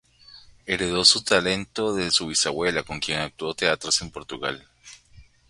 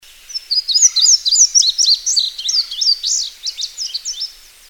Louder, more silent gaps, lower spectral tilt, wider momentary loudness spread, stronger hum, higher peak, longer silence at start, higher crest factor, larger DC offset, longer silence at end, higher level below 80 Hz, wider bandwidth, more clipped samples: second, -22 LUFS vs -12 LUFS; neither; first, -2 dB/octave vs 7 dB/octave; about the same, 14 LU vs 14 LU; neither; about the same, -2 dBFS vs 0 dBFS; about the same, 0.3 s vs 0.3 s; first, 24 dB vs 16 dB; neither; second, 0.25 s vs 0.4 s; about the same, -52 dBFS vs -54 dBFS; second, 11.5 kHz vs 19.5 kHz; neither